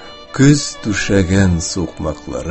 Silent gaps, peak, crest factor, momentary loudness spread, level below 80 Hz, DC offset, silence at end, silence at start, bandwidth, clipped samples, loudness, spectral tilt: none; 0 dBFS; 16 dB; 12 LU; -30 dBFS; under 0.1%; 0 s; 0 s; 8.6 kHz; under 0.1%; -15 LUFS; -5.5 dB/octave